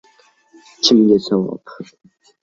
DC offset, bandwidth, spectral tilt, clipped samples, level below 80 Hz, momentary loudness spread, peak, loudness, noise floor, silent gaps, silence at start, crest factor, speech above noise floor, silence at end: under 0.1%; 7.8 kHz; -5 dB/octave; under 0.1%; -58 dBFS; 25 LU; 0 dBFS; -15 LUFS; -54 dBFS; none; 0.85 s; 18 dB; 37 dB; 0.6 s